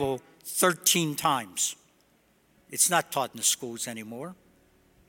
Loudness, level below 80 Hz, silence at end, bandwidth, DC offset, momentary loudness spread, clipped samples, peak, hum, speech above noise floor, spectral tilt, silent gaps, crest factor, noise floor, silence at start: -26 LUFS; -66 dBFS; 0.75 s; 17 kHz; under 0.1%; 16 LU; under 0.1%; -6 dBFS; none; 37 dB; -2 dB/octave; none; 22 dB; -65 dBFS; 0 s